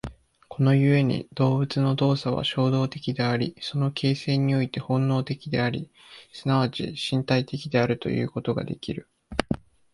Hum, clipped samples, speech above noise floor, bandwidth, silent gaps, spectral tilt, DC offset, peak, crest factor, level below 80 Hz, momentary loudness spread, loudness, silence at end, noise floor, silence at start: none; under 0.1%; 21 dB; 11.5 kHz; none; -7 dB/octave; under 0.1%; -2 dBFS; 22 dB; -52 dBFS; 10 LU; -25 LUFS; 0.35 s; -45 dBFS; 0.05 s